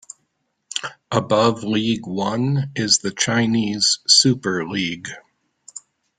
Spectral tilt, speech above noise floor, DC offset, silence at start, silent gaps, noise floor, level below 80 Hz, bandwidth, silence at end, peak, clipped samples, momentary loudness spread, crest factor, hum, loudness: -3.5 dB/octave; 52 dB; under 0.1%; 0.75 s; none; -71 dBFS; -58 dBFS; 9.6 kHz; 0.4 s; 0 dBFS; under 0.1%; 18 LU; 20 dB; none; -19 LUFS